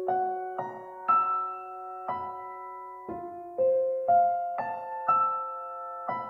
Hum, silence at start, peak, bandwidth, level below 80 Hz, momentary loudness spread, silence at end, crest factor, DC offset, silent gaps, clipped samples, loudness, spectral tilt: none; 0 s; -14 dBFS; 4.3 kHz; -74 dBFS; 15 LU; 0 s; 16 dB; under 0.1%; none; under 0.1%; -29 LUFS; -8 dB/octave